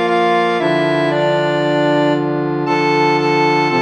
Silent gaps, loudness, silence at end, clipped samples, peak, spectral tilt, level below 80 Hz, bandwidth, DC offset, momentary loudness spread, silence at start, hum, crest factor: none; -15 LUFS; 0 s; under 0.1%; -2 dBFS; -6.5 dB/octave; -60 dBFS; 11 kHz; under 0.1%; 3 LU; 0 s; none; 12 dB